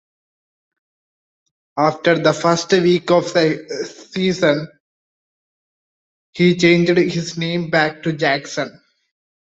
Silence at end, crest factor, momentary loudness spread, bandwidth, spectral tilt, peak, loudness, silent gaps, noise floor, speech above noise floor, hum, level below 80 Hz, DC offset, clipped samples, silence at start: 0.8 s; 18 dB; 13 LU; 8 kHz; -5.5 dB/octave; -2 dBFS; -17 LUFS; 4.80-6.33 s; under -90 dBFS; over 73 dB; none; -58 dBFS; under 0.1%; under 0.1%; 1.75 s